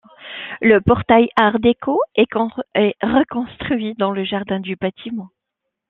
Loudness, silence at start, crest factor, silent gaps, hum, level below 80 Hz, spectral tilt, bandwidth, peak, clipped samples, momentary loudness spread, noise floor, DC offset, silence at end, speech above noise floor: -17 LUFS; 0.2 s; 18 dB; none; none; -48 dBFS; -8.5 dB/octave; 4.2 kHz; -2 dBFS; under 0.1%; 15 LU; -79 dBFS; under 0.1%; 0.65 s; 62 dB